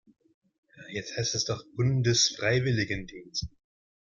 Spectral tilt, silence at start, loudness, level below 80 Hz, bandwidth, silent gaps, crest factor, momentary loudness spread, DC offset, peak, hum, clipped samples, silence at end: -3.5 dB/octave; 0.75 s; -28 LUFS; -54 dBFS; 7.4 kHz; none; 20 dB; 13 LU; under 0.1%; -10 dBFS; none; under 0.1%; 0.65 s